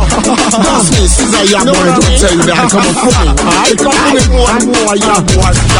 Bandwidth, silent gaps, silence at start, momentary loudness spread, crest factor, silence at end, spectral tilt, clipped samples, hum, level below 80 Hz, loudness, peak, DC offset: 13.5 kHz; none; 0 s; 2 LU; 8 dB; 0 s; -4 dB/octave; 0.8%; none; -16 dBFS; -8 LUFS; 0 dBFS; under 0.1%